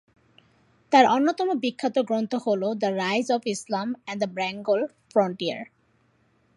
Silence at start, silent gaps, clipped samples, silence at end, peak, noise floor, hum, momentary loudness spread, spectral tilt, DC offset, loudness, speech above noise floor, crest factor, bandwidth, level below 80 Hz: 0.9 s; none; under 0.1%; 0.95 s; -4 dBFS; -65 dBFS; none; 10 LU; -4.5 dB/octave; under 0.1%; -25 LUFS; 41 dB; 22 dB; 11.5 kHz; -76 dBFS